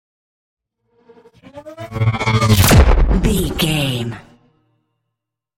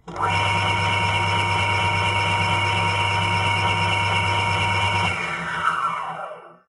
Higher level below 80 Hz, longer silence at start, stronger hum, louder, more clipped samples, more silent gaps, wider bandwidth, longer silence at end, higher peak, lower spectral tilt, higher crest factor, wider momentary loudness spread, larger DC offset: first, -22 dBFS vs -46 dBFS; first, 1.55 s vs 0.05 s; neither; first, -15 LUFS vs -20 LUFS; neither; neither; first, 16.5 kHz vs 11.5 kHz; first, 1.4 s vs 0.15 s; first, -2 dBFS vs -8 dBFS; about the same, -5 dB/octave vs -4 dB/octave; about the same, 16 dB vs 14 dB; first, 20 LU vs 5 LU; neither